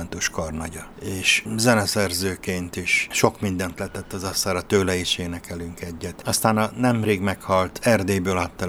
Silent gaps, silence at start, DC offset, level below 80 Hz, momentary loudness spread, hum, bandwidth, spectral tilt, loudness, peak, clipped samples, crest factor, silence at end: none; 0 s; under 0.1%; -46 dBFS; 13 LU; none; over 20 kHz; -4 dB/octave; -22 LUFS; 0 dBFS; under 0.1%; 24 dB; 0 s